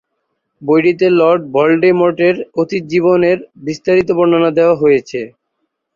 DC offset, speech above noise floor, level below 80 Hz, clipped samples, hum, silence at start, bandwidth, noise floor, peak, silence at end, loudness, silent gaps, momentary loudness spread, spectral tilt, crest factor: under 0.1%; 58 dB; -54 dBFS; under 0.1%; none; 0.6 s; 7.2 kHz; -70 dBFS; -2 dBFS; 0.65 s; -13 LUFS; none; 10 LU; -7 dB/octave; 12 dB